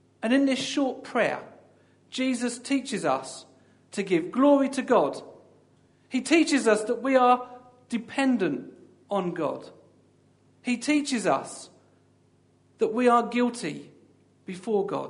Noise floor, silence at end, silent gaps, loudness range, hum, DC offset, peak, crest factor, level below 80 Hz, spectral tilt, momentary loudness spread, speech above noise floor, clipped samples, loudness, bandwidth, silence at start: -63 dBFS; 0 s; none; 6 LU; none; under 0.1%; -8 dBFS; 20 dB; -78 dBFS; -4.5 dB/octave; 16 LU; 38 dB; under 0.1%; -25 LUFS; 11 kHz; 0.2 s